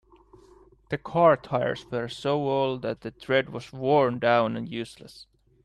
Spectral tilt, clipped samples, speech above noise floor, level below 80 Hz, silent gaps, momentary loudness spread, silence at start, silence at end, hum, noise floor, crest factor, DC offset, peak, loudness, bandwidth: -6.5 dB/octave; under 0.1%; 30 dB; -60 dBFS; none; 15 LU; 0.9 s; 0.4 s; none; -55 dBFS; 20 dB; under 0.1%; -8 dBFS; -26 LUFS; 12 kHz